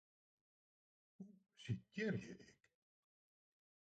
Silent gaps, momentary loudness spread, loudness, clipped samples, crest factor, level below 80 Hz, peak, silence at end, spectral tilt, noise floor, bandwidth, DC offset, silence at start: none; 18 LU; -47 LUFS; under 0.1%; 22 dB; -78 dBFS; -30 dBFS; 1.35 s; -6.5 dB/octave; under -90 dBFS; 8.8 kHz; under 0.1%; 1.2 s